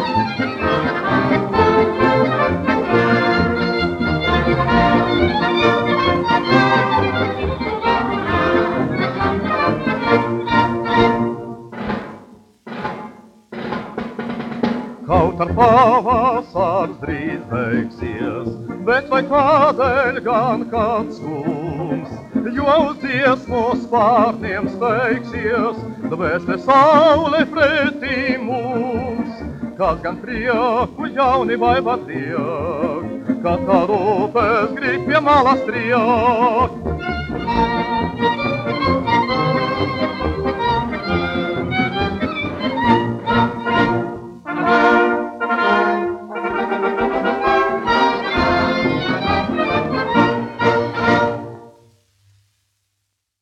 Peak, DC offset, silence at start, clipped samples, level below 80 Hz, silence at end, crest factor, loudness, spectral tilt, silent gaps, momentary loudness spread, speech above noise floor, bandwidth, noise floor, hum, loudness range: 0 dBFS; under 0.1%; 0 s; under 0.1%; -40 dBFS; 1.7 s; 16 dB; -17 LUFS; -7 dB/octave; none; 10 LU; 57 dB; 9.4 kHz; -73 dBFS; none; 4 LU